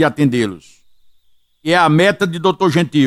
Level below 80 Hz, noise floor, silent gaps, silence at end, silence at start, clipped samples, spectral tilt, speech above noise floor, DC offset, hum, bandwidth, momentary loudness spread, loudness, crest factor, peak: -56 dBFS; -54 dBFS; none; 0 s; 0 s; under 0.1%; -6 dB/octave; 40 dB; under 0.1%; 60 Hz at -45 dBFS; 14 kHz; 8 LU; -14 LUFS; 14 dB; 0 dBFS